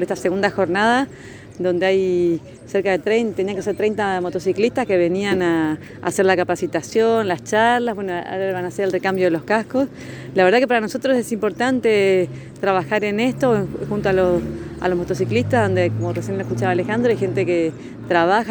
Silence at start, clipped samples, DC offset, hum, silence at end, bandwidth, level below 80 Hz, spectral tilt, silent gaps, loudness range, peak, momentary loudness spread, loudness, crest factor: 0 s; under 0.1%; under 0.1%; none; 0 s; over 20 kHz; -50 dBFS; -6 dB/octave; none; 2 LU; -2 dBFS; 8 LU; -19 LUFS; 18 dB